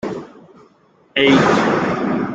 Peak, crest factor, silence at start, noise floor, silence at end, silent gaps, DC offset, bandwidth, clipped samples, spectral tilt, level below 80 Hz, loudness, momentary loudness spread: -2 dBFS; 16 dB; 0.05 s; -53 dBFS; 0 s; none; under 0.1%; 8.8 kHz; under 0.1%; -5.5 dB/octave; -52 dBFS; -15 LUFS; 14 LU